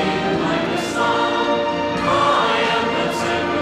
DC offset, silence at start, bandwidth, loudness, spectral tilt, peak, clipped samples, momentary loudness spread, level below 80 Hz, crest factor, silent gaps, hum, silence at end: under 0.1%; 0 s; 15 kHz; -18 LUFS; -4.5 dB/octave; -6 dBFS; under 0.1%; 4 LU; -48 dBFS; 12 dB; none; none; 0 s